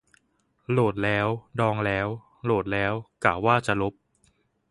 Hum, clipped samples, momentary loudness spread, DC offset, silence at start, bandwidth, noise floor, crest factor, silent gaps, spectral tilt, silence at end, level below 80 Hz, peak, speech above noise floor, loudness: none; under 0.1%; 8 LU; under 0.1%; 0.7 s; 11.5 kHz; -68 dBFS; 24 dB; none; -7 dB/octave; 0.8 s; -52 dBFS; -4 dBFS; 44 dB; -26 LUFS